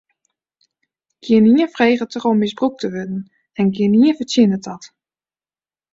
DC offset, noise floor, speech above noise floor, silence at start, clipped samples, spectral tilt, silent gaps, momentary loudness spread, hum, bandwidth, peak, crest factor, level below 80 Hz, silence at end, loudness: under 0.1%; under -90 dBFS; over 74 dB; 1.25 s; under 0.1%; -6.5 dB/octave; none; 16 LU; none; 7.8 kHz; -2 dBFS; 16 dB; -60 dBFS; 1.05 s; -16 LUFS